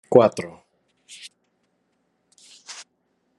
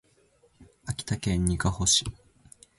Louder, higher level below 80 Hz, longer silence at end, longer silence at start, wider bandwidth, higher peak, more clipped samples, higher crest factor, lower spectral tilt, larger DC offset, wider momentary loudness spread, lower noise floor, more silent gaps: first, -19 LUFS vs -26 LUFS; second, -70 dBFS vs -42 dBFS; about the same, 0.65 s vs 0.65 s; second, 0.1 s vs 0.6 s; about the same, 11.5 kHz vs 11.5 kHz; first, 0 dBFS vs -10 dBFS; neither; first, 26 dB vs 20 dB; first, -6 dB/octave vs -3 dB/octave; neither; first, 28 LU vs 16 LU; first, -70 dBFS vs -64 dBFS; neither